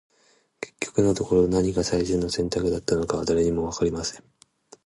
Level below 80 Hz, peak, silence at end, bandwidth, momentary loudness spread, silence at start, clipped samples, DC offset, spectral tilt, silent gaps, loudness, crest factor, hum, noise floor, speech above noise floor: -44 dBFS; -8 dBFS; 0.7 s; 11.5 kHz; 10 LU; 0.6 s; under 0.1%; under 0.1%; -5.5 dB/octave; none; -24 LUFS; 18 dB; none; -63 dBFS; 40 dB